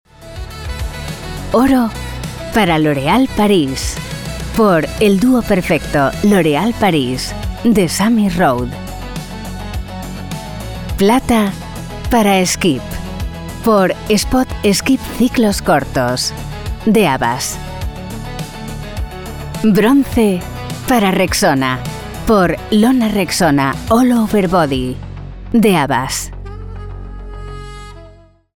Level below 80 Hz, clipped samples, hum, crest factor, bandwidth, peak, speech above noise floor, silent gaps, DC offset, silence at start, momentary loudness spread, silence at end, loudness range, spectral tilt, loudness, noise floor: -30 dBFS; under 0.1%; none; 12 dB; 19.5 kHz; -2 dBFS; 29 dB; none; under 0.1%; 0.2 s; 15 LU; 0.5 s; 5 LU; -5 dB/octave; -15 LUFS; -42 dBFS